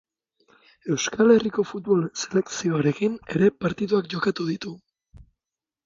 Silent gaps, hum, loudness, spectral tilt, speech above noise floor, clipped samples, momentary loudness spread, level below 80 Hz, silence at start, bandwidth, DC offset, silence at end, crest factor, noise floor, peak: none; none; -23 LUFS; -5.5 dB/octave; 67 dB; under 0.1%; 11 LU; -60 dBFS; 0.85 s; 7.6 kHz; under 0.1%; 0.65 s; 20 dB; -89 dBFS; -6 dBFS